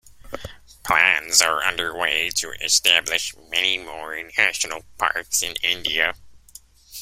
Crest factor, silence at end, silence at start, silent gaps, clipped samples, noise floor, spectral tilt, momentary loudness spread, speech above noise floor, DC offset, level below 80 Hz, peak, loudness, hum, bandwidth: 22 dB; 0 s; 0.05 s; none; under 0.1%; -48 dBFS; 1 dB/octave; 20 LU; 26 dB; under 0.1%; -52 dBFS; 0 dBFS; -20 LUFS; none; 16 kHz